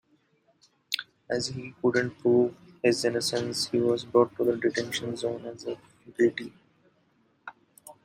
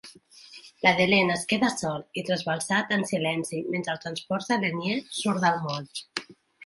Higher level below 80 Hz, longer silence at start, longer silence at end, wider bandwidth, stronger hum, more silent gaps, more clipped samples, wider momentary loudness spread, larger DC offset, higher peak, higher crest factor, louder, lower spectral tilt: about the same, -68 dBFS vs -66 dBFS; first, 0.9 s vs 0.05 s; first, 0.15 s vs 0 s; first, 16 kHz vs 11.5 kHz; neither; neither; neither; first, 17 LU vs 13 LU; neither; about the same, -8 dBFS vs -6 dBFS; about the same, 22 dB vs 20 dB; about the same, -28 LUFS vs -26 LUFS; about the same, -4.5 dB/octave vs -4 dB/octave